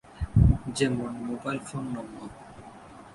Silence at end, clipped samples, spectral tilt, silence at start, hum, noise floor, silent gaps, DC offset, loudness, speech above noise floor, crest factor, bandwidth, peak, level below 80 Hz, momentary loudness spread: 0 s; under 0.1%; -6.5 dB/octave; 0.1 s; none; -47 dBFS; none; under 0.1%; -28 LUFS; 16 dB; 22 dB; 11.5 kHz; -6 dBFS; -34 dBFS; 24 LU